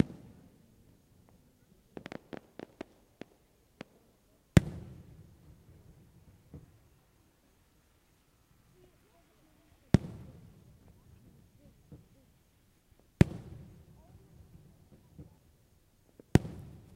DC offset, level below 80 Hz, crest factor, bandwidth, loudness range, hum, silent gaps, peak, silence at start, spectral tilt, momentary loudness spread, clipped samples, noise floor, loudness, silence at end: under 0.1%; -52 dBFS; 34 dB; 16 kHz; 16 LU; none; none; -4 dBFS; 0 s; -7.5 dB/octave; 30 LU; under 0.1%; -68 dBFS; -32 LUFS; 0.35 s